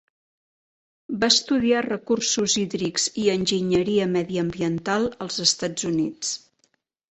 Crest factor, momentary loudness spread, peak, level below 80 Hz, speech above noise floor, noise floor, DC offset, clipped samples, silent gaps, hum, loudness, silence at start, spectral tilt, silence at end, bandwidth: 22 dB; 8 LU; -2 dBFS; -58 dBFS; 46 dB; -69 dBFS; under 0.1%; under 0.1%; none; none; -22 LUFS; 1.1 s; -3.5 dB/octave; 0.75 s; 8.6 kHz